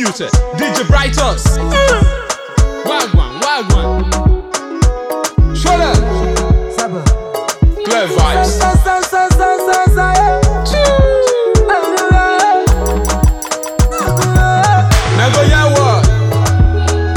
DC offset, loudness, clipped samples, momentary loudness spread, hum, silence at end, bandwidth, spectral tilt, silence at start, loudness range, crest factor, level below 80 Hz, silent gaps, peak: under 0.1%; -12 LUFS; under 0.1%; 5 LU; none; 0 s; 18.5 kHz; -5 dB/octave; 0 s; 3 LU; 10 dB; -16 dBFS; none; 0 dBFS